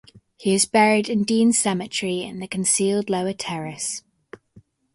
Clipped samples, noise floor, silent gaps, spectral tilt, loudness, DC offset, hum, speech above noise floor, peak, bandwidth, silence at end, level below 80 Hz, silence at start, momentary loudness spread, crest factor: under 0.1%; -54 dBFS; none; -3.5 dB/octave; -21 LUFS; under 0.1%; none; 33 dB; -4 dBFS; 11.5 kHz; 0.95 s; -64 dBFS; 0.15 s; 11 LU; 18 dB